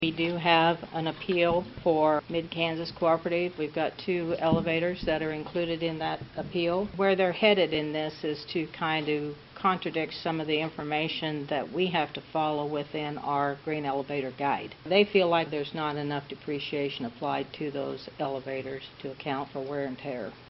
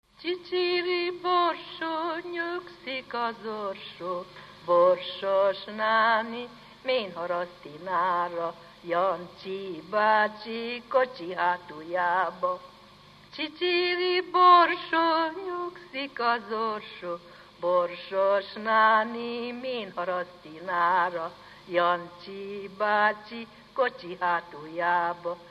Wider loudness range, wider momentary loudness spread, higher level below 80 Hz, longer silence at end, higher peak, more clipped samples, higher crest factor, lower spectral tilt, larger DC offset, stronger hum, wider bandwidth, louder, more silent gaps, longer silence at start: about the same, 5 LU vs 6 LU; second, 11 LU vs 15 LU; first, -58 dBFS vs -70 dBFS; about the same, 0.05 s vs 0 s; about the same, -6 dBFS vs -6 dBFS; neither; about the same, 22 dB vs 20 dB; second, -3.5 dB/octave vs -5.5 dB/octave; neither; second, none vs 50 Hz at -70 dBFS; second, 5.8 kHz vs 8.8 kHz; about the same, -29 LUFS vs -27 LUFS; neither; second, 0 s vs 0.2 s